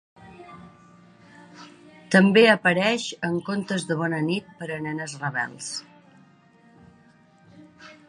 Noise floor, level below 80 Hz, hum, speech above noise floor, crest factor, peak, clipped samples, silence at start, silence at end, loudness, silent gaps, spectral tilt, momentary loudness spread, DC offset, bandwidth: -56 dBFS; -68 dBFS; none; 33 dB; 22 dB; -4 dBFS; under 0.1%; 0.25 s; 0.15 s; -23 LUFS; none; -5 dB/octave; 18 LU; under 0.1%; 11 kHz